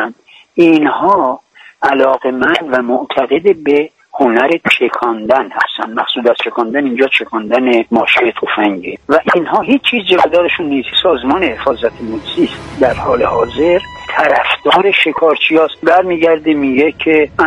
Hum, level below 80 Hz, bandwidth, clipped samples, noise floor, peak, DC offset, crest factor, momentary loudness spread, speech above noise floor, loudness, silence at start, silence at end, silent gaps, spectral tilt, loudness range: none; -44 dBFS; 9.8 kHz; under 0.1%; -35 dBFS; 0 dBFS; under 0.1%; 12 dB; 6 LU; 23 dB; -12 LUFS; 0 s; 0 s; none; -5.5 dB/octave; 3 LU